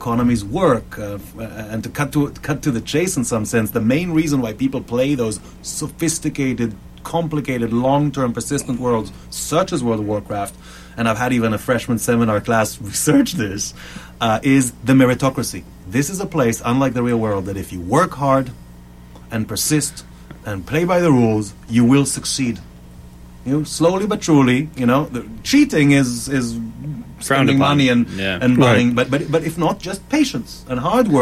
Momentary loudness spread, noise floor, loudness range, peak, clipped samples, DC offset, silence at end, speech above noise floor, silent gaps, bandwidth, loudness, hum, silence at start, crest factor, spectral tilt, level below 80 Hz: 13 LU; -40 dBFS; 4 LU; -2 dBFS; under 0.1%; under 0.1%; 0 s; 22 dB; none; 15.5 kHz; -18 LUFS; none; 0 s; 16 dB; -5 dB/octave; -42 dBFS